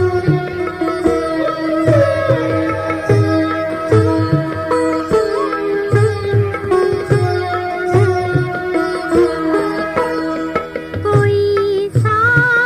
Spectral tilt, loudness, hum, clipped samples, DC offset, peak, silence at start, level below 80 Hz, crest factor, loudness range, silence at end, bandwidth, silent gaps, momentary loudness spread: -7.5 dB/octave; -15 LUFS; none; under 0.1%; under 0.1%; 0 dBFS; 0 s; -40 dBFS; 14 dB; 1 LU; 0 s; 14 kHz; none; 6 LU